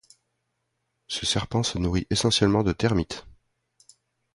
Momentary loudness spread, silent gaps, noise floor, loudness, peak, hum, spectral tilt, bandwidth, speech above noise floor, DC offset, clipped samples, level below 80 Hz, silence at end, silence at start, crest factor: 11 LU; none; -77 dBFS; -24 LUFS; -6 dBFS; none; -4.5 dB/octave; 11.5 kHz; 53 dB; under 0.1%; under 0.1%; -42 dBFS; 1.05 s; 1.1 s; 22 dB